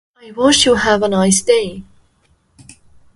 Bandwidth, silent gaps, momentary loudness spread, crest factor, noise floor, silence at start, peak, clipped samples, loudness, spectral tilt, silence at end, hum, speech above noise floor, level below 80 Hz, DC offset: 11.5 kHz; none; 17 LU; 16 dB; -58 dBFS; 0.25 s; 0 dBFS; under 0.1%; -13 LUFS; -3 dB/octave; 1.35 s; none; 44 dB; -44 dBFS; under 0.1%